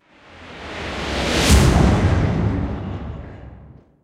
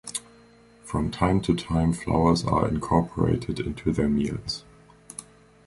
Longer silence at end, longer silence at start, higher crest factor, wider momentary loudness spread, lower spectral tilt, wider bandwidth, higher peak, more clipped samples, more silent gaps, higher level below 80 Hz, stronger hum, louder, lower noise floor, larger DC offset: about the same, 0.35 s vs 0.45 s; first, 0.3 s vs 0.05 s; about the same, 18 dB vs 20 dB; first, 22 LU vs 13 LU; second, -5 dB/octave vs -6.5 dB/octave; first, 16 kHz vs 11.5 kHz; first, -2 dBFS vs -6 dBFS; neither; neither; first, -24 dBFS vs -40 dBFS; neither; first, -18 LUFS vs -25 LUFS; second, -44 dBFS vs -54 dBFS; neither